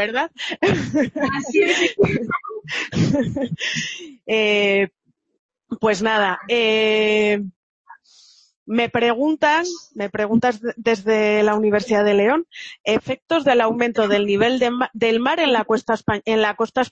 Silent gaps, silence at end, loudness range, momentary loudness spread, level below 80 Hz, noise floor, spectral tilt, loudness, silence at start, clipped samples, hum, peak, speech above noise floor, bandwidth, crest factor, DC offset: 5.39-5.49 s, 7.56-7.85 s, 8.56-8.66 s, 12.80-12.84 s, 13.22-13.26 s; 0.05 s; 3 LU; 9 LU; -54 dBFS; -52 dBFS; -5 dB/octave; -19 LUFS; 0 s; under 0.1%; none; -4 dBFS; 33 dB; 8.2 kHz; 16 dB; under 0.1%